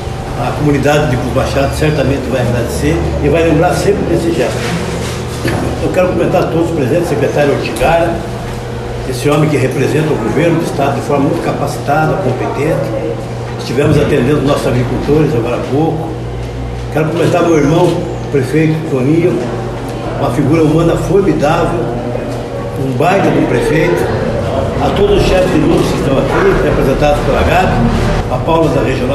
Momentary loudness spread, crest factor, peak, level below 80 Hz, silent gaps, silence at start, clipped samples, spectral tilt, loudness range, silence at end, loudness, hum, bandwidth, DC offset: 8 LU; 12 dB; 0 dBFS; -26 dBFS; none; 0 s; under 0.1%; -6.5 dB/octave; 2 LU; 0 s; -13 LUFS; none; 14.5 kHz; under 0.1%